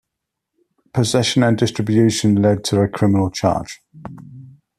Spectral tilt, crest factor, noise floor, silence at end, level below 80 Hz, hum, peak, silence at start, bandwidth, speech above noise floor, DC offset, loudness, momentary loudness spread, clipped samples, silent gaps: -5.5 dB/octave; 16 dB; -80 dBFS; 0.3 s; -50 dBFS; none; -2 dBFS; 0.95 s; 13.5 kHz; 64 dB; under 0.1%; -17 LUFS; 20 LU; under 0.1%; none